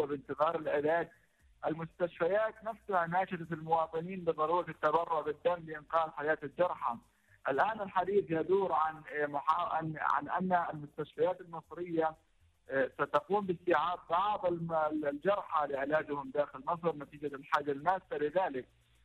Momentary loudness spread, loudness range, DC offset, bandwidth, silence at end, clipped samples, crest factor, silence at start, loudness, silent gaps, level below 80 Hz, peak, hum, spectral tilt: 7 LU; 2 LU; under 0.1%; 11 kHz; 0.4 s; under 0.1%; 16 dB; 0 s; -34 LUFS; none; -70 dBFS; -18 dBFS; none; -7.5 dB/octave